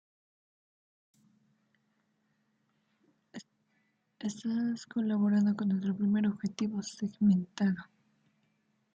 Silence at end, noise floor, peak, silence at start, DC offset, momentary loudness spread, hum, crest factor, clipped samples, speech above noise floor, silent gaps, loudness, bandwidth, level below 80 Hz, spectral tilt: 1.1 s; -76 dBFS; -18 dBFS; 3.35 s; under 0.1%; 12 LU; none; 16 dB; under 0.1%; 46 dB; none; -32 LUFS; 7.8 kHz; -76 dBFS; -7 dB/octave